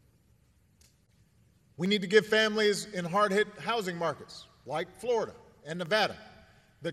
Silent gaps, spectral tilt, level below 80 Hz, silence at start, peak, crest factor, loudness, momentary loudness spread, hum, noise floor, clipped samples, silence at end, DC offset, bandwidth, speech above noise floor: none; -4 dB/octave; -70 dBFS; 1.8 s; -8 dBFS; 24 dB; -29 LUFS; 17 LU; none; -65 dBFS; under 0.1%; 0 s; under 0.1%; 14 kHz; 36 dB